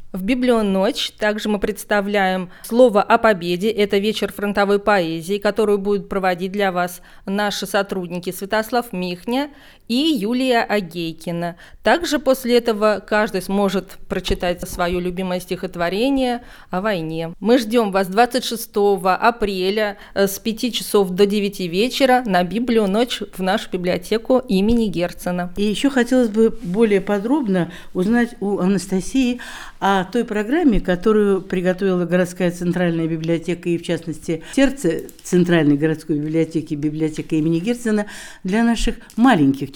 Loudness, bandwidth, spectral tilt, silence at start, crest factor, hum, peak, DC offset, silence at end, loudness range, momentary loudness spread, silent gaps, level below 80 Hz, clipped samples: -19 LUFS; 19.5 kHz; -5.5 dB/octave; 0 s; 18 dB; none; 0 dBFS; under 0.1%; 0 s; 4 LU; 8 LU; none; -38 dBFS; under 0.1%